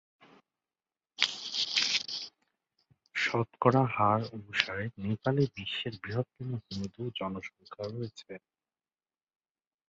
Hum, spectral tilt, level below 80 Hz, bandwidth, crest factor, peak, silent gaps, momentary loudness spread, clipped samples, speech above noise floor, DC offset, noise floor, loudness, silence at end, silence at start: none; -4.5 dB/octave; -66 dBFS; 8 kHz; 28 dB; -6 dBFS; none; 15 LU; under 0.1%; over 58 dB; under 0.1%; under -90 dBFS; -32 LUFS; 1.5 s; 1.2 s